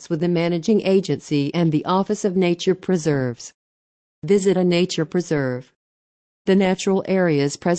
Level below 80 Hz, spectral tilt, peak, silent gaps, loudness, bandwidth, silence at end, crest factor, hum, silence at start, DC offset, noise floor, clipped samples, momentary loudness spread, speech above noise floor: -60 dBFS; -6 dB/octave; -6 dBFS; 3.54-4.22 s, 5.76-6.45 s; -20 LUFS; 9 kHz; 0 s; 14 dB; none; 0 s; under 0.1%; under -90 dBFS; under 0.1%; 8 LU; over 71 dB